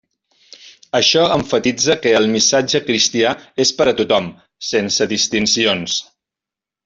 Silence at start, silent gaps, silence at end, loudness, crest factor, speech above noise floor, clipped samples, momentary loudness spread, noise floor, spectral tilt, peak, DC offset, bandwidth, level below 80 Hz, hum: 0.65 s; none; 0.85 s; -15 LUFS; 16 dB; 71 dB; under 0.1%; 7 LU; -87 dBFS; -2.5 dB/octave; -2 dBFS; under 0.1%; 8 kHz; -54 dBFS; none